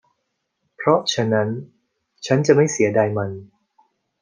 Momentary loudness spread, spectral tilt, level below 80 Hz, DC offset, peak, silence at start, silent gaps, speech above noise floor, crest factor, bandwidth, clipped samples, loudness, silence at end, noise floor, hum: 15 LU; -5 dB/octave; -66 dBFS; under 0.1%; -2 dBFS; 0.8 s; none; 56 dB; 20 dB; 10 kHz; under 0.1%; -19 LUFS; 0.75 s; -75 dBFS; none